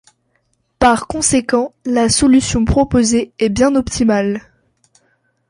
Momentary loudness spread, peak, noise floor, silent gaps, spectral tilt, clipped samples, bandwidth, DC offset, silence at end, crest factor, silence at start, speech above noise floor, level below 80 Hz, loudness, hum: 6 LU; -2 dBFS; -64 dBFS; none; -4.5 dB/octave; under 0.1%; 11.5 kHz; under 0.1%; 1.1 s; 14 dB; 0.8 s; 50 dB; -32 dBFS; -14 LUFS; none